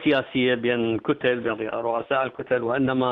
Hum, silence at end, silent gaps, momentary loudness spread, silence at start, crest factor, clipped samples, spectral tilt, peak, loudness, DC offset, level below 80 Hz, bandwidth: none; 0 s; none; 5 LU; 0 s; 14 dB; under 0.1%; -8.5 dB/octave; -10 dBFS; -24 LUFS; under 0.1%; -60 dBFS; 5 kHz